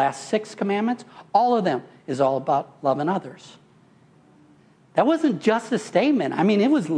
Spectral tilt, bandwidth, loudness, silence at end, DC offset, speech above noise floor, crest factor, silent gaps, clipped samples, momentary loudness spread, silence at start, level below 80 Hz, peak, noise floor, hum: -6 dB/octave; 10.5 kHz; -22 LUFS; 0 s; under 0.1%; 33 dB; 18 dB; none; under 0.1%; 7 LU; 0 s; -72 dBFS; -4 dBFS; -55 dBFS; none